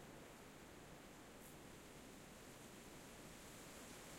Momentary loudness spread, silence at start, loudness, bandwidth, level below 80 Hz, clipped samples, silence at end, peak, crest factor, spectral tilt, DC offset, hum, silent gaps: 3 LU; 0 s; -58 LUFS; 16.5 kHz; -72 dBFS; under 0.1%; 0 s; -46 dBFS; 14 dB; -3.5 dB/octave; under 0.1%; none; none